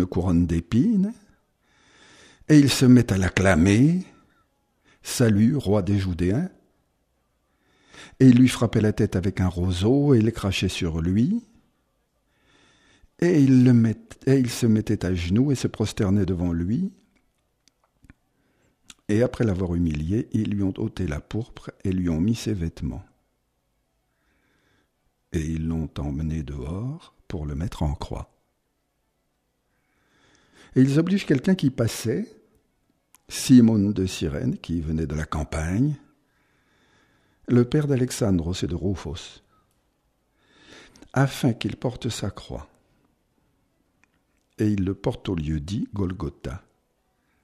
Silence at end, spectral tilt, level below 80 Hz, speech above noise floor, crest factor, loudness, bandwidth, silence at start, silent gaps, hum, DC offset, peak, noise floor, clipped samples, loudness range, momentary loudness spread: 0.85 s; -6.5 dB/octave; -42 dBFS; 51 dB; 20 dB; -23 LUFS; 15.5 kHz; 0 s; none; none; under 0.1%; -4 dBFS; -73 dBFS; under 0.1%; 11 LU; 15 LU